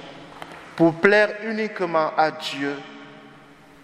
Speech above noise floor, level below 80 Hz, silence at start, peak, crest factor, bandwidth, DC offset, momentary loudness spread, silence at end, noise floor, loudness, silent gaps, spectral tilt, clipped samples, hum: 27 dB; -66 dBFS; 0 s; 0 dBFS; 24 dB; 11.5 kHz; under 0.1%; 23 LU; 0.55 s; -48 dBFS; -21 LUFS; none; -5.5 dB/octave; under 0.1%; none